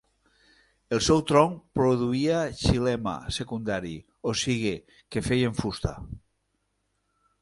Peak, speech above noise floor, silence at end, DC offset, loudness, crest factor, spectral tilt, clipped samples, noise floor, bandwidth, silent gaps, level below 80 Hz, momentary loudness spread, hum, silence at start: -4 dBFS; 49 dB; 1.25 s; under 0.1%; -26 LUFS; 24 dB; -5.5 dB/octave; under 0.1%; -75 dBFS; 11.5 kHz; none; -44 dBFS; 12 LU; none; 0.9 s